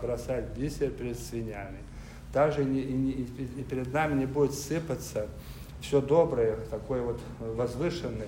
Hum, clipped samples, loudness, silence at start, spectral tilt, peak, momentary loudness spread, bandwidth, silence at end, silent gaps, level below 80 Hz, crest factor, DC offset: none; under 0.1%; -31 LUFS; 0 s; -6.5 dB/octave; -12 dBFS; 14 LU; 16 kHz; 0 s; none; -46 dBFS; 18 dB; under 0.1%